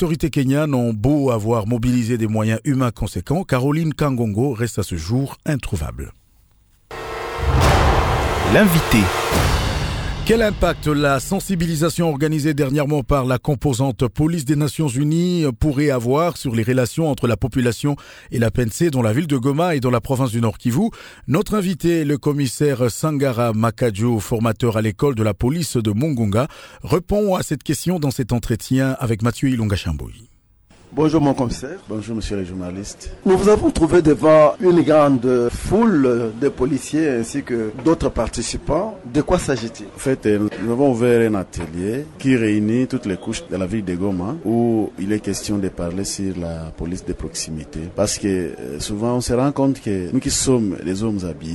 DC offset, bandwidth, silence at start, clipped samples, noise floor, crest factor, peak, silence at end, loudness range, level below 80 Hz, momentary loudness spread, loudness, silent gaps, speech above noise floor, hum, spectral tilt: under 0.1%; 19.5 kHz; 0 s; under 0.1%; -55 dBFS; 16 dB; -2 dBFS; 0 s; 6 LU; -34 dBFS; 10 LU; -19 LUFS; none; 36 dB; none; -6 dB/octave